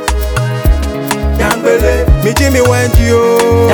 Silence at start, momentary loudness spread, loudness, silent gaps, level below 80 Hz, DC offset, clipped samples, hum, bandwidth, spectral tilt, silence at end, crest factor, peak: 0 s; 6 LU; -11 LUFS; none; -16 dBFS; under 0.1%; 0.4%; none; 19.5 kHz; -5.5 dB/octave; 0 s; 10 dB; 0 dBFS